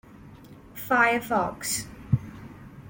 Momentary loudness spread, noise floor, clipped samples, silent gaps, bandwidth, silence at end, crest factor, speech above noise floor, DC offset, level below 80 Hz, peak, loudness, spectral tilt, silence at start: 22 LU; -48 dBFS; under 0.1%; none; 17 kHz; 0 s; 20 dB; 23 dB; under 0.1%; -52 dBFS; -8 dBFS; -25 LUFS; -4.5 dB/octave; 0.15 s